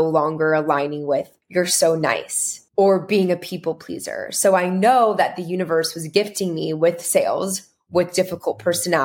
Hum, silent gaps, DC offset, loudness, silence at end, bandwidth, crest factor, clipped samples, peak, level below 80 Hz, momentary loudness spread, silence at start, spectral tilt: none; none; under 0.1%; -20 LUFS; 0 s; 17.5 kHz; 18 dB; under 0.1%; -2 dBFS; -66 dBFS; 9 LU; 0 s; -4 dB/octave